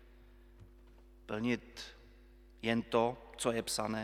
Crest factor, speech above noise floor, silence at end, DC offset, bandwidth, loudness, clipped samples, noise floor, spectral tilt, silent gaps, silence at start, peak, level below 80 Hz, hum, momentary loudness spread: 22 dB; 24 dB; 0 s; under 0.1%; 16 kHz; -36 LUFS; under 0.1%; -59 dBFS; -4 dB/octave; none; 0 s; -16 dBFS; -60 dBFS; none; 16 LU